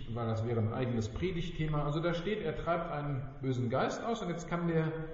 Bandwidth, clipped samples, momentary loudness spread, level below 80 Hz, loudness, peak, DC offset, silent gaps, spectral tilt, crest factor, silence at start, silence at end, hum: 7.6 kHz; under 0.1%; 4 LU; -48 dBFS; -35 LUFS; -18 dBFS; under 0.1%; none; -6.5 dB/octave; 16 dB; 0 s; 0 s; none